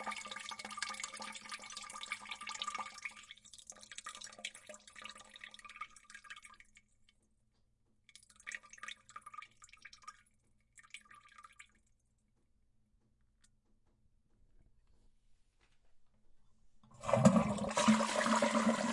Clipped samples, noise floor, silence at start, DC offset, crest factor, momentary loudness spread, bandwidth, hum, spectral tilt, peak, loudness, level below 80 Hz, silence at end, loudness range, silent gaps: under 0.1%; -76 dBFS; 0 s; under 0.1%; 28 dB; 25 LU; 11.5 kHz; none; -4.5 dB/octave; -12 dBFS; -37 LUFS; -70 dBFS; 0 s; 24 LU; none